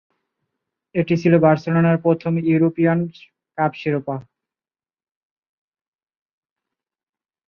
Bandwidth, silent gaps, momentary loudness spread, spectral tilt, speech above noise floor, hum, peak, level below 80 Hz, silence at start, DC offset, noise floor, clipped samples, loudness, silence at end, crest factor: 6.4 kHz; none; 14 LU; -9.5 dB/octave; over 72 dB; none; -2 dBFS; -62 dBFS; 0.95 s; under 0.1%; under -90 dBFS; under 0.1%; -19 LUFS; 3.25 s; 20 dB